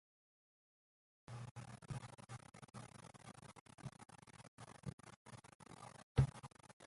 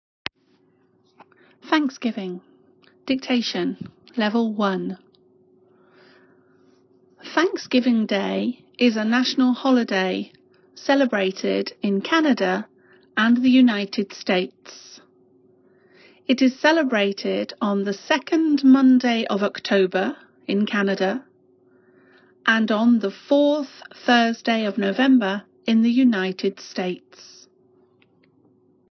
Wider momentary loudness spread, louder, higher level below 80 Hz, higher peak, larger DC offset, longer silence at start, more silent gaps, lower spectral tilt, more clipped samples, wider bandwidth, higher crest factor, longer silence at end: first, 20 LU vs 15 LU; second, -49 LUFS vs -21 LUFS; first, -62 dBFS vs -72 dBFS; second, -20 dBFS vs -2 dBFS; neither; second, 1.3 s vs 1.65 s; first, 1.51-1.55 s, 3.61-3.66 s, 4.48-4.58 s, 4.93-4.98 s, 5.16-5.25 s, 5.55-5.59 s, 6.03-6.15 s, 6.73-6.80 s vs none; about the same, -6.5 dB/octave vs -5.5 dB/octave; neither; first, 11.5 kHz vs 6.4 kHz; first, 28 dB vs 20 dB; second, 0 s vs 1.9 s